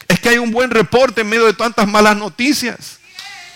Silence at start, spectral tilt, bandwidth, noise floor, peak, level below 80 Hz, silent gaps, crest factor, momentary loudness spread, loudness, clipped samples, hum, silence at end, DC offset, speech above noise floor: 0.1 s; -4 dB/octave; 16.5 kHz; -34 dBFS; -2 dBFS; -44 dBFS; none; 12 dB; 20 LU; -13 LUFS; under 0.1%; none; 0.05 s; under 0.1%; 21 dB